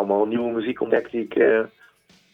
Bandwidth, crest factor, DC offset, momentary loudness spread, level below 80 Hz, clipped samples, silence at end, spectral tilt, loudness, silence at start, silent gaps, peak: 5.2 kHz; 18 dB; under 0.1%; 7 LU; -64 dBFS; under 0.1%; 0.65 s; -7.5 dB/octave; -22 LUFS; 0 s; none; -6 dBFS